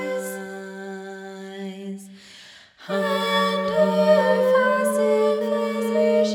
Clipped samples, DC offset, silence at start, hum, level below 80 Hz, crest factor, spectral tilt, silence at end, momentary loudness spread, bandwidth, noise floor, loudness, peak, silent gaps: under 0.1%; under 0.1%; 0 s; none; -70 dBFS; 16 dB; -5 dB/octave; 0 s; 19 LU; 18.5 kHz; -47 dBFS; -20 LUFS; -6 dBFS; none